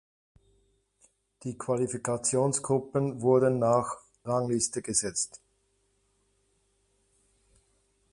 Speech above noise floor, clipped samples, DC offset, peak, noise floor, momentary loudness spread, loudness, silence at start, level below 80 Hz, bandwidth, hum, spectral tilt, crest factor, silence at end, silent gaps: 44 dB; under 0.1%; under 0.1%; -10 dBFS; -72 dBFS; 13 LU; -28 LUFS; 1.45 s; -64 dBFS; 11.5 kHz; none; -5 dB/octave; 20 dB; 2.75 s; none